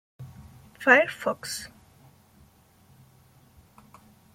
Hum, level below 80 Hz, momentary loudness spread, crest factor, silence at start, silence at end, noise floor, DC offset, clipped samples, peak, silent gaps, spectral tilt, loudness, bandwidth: none; -64 dBFS; 27 LU; 26 dB; 0.2 s; 2.7 s; -58 dBFS; under 0.1%; under 0.1%; -4 dBFS; none; -3 dB/octave; -23 LUFS; 16.5 kHz